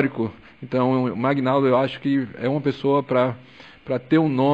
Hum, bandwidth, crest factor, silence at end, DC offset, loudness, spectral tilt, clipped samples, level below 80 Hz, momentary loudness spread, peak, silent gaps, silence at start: none; 7.4 kHz; 14 dB; 0 s; 0.1%; -22 LUFS; -9 dB/octave; under 0.1%; -62 dBFS; 10 LU; -8 dBFS; none; 0 s